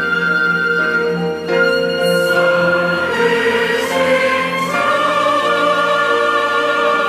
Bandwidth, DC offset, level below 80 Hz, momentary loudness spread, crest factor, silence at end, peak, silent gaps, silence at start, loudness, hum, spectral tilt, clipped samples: 16 kHz; under 0.1%; -60 dBFS; 3 LU; 12 dB; 0 s; -4 dBFS; none; 0 s; -14 LUFS; none; -4 dB/octave; under 0.1%